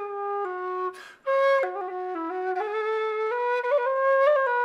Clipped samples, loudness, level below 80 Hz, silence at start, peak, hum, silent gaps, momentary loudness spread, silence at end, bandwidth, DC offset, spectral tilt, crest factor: under 0.1%; -26 LUFS; -82 dBFS; 0 s; -12 dBFS; none; none; 11 LU; 0 s; 7.8 kHz; under 0.1%; -3 dB/octave; 14 dB